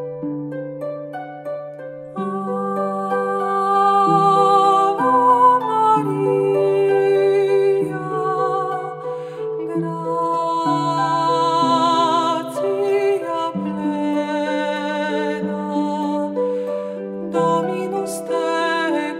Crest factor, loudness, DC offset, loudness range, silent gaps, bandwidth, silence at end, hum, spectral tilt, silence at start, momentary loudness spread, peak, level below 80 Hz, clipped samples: 16 dB; -19 LUFS; under 0.1%; 7 LU; none; 13.5 kHz; 0 s; none; -6 dB/octave; 0 s; 13 LU; -4 dBFS; -68 dBFS; under 0.1%